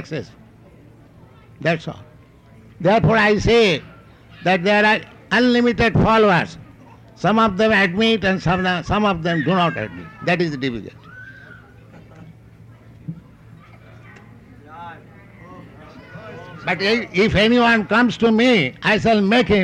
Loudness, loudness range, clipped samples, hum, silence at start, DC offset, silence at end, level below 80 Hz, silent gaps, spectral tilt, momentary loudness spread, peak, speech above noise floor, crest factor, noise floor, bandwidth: -17 LUFS; 10 LU; under 0.1%; none; 0 s; under 0.1%; 0 s; -42 dBFS; none; -6 dB/octave; 22 LU; -4 dBFS; 30 dB; 14 dB; -47 dBFS; 10 kHz